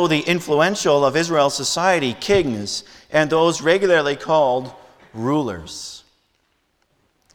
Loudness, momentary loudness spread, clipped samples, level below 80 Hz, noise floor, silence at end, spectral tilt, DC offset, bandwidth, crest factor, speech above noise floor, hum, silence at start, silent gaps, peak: -18 LUFS; 13 LU; under 0.1%; -52 dBFS; -66 dBFS; 1.35 s; -4 dB/octave; under 0.1%; 18 kHz; 16 dB; 48 dB; none; 0 s; none; -4 dBFS